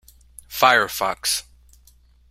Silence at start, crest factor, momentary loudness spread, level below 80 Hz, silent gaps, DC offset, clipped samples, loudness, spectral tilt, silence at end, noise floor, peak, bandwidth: 0.5 s; 22 dB; 10 LU; -54 dBFS; none; under 0.1%; under 0.1%; -19 LUFS; -1 dB/octave; 0.9 s; -54 dBFS; -2 dBFS; 16.5 kHz